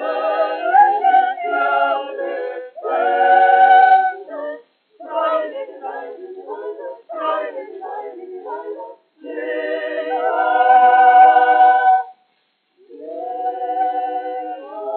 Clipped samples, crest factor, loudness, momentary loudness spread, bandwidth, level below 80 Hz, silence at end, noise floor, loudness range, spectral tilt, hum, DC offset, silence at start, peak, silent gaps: under 0.1%; 16 dB; -15 LUFS; 21 LU; 4.4 kHz; under -90 dBFS; 0 s; -65 dBFS; 14 LU; 3 dB/octave; none; under 0.1%; 0 s; 0 dBFS; none